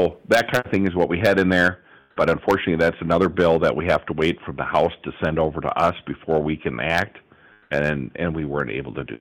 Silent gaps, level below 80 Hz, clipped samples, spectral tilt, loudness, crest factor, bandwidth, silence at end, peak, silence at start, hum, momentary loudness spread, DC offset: none; -44 dBFS; under 0.1%; -6.5 dB/octave; -21 LUFS; 14 dB; 16.5 kHz; 0.05 s; -8 dBFS; 0 s; none; 9 LU; under 0.1%